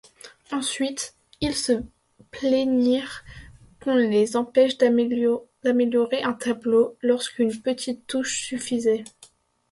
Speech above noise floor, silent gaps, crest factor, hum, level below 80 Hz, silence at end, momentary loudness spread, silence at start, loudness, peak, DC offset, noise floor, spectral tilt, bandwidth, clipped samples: 32 dB; none; 18 dB; none; -56 dBFS; 0.65 s; 11 LU; 0.25 s; -23 LUFS; -6 dBFS; under 0.1%; -55 dBFS; -4 dB/octave; 11.5 kHz; under 0.1%